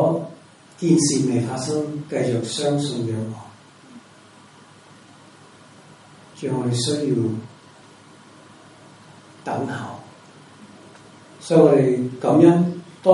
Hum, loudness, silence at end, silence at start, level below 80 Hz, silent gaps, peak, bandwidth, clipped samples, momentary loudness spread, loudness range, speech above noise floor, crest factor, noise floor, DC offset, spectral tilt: none; -20 LUFS; 0 s; 0 s; -64 dBFS; none; 0 dBFS; 11.5 kHz; under 0.1%; 18 LU; 15 LU; 29 dB; 22 dB; -48 dBFS; under 0.1%; -6 dB/octave